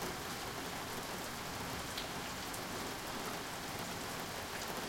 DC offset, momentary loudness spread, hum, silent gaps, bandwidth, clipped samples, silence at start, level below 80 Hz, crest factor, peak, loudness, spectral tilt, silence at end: under 0.1%; 1 LU; none; none; 17 kHz; under 0.1%; 0 s; -60 dBFS; 16 dB; -26 dBFS; -41 LUFS; -3 dB/octave; 0 s